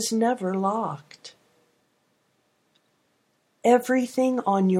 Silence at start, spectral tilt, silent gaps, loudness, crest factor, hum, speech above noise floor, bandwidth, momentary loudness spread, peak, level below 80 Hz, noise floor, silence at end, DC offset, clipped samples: 0 s; -5.5 dB/octave; none; -24 LUFS; 20 dB; none; 46 dB; 16 kHz; 22 LU; -6 dBFS; -78 dBFS; -69 dBFS; 0 s; under 0.1%; under 0.1%